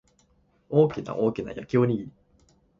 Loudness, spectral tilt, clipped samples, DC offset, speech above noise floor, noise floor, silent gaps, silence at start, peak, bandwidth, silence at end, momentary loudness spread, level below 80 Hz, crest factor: -26 LUFS; -9 dB/octave; under 0.1%; under 0.1%; 40 dB; -65 dBFS; none; 0.7 s; -8 dBFS; 7.4 kHz; 0.7 s; 11 LU; -60 dBFS; 20 dB